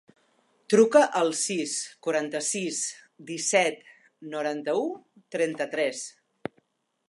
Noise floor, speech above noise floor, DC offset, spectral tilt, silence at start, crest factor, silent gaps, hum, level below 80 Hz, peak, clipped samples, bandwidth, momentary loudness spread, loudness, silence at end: -69 dBFS; 44 dB; under 0.1%; -3 dB/octave; 0.7 s; 20 dB; none; none; -80 dBFS; -6 dBFS; under 0.1%; 11.5 kHz; 20 LU; -26 LUFS; 1 s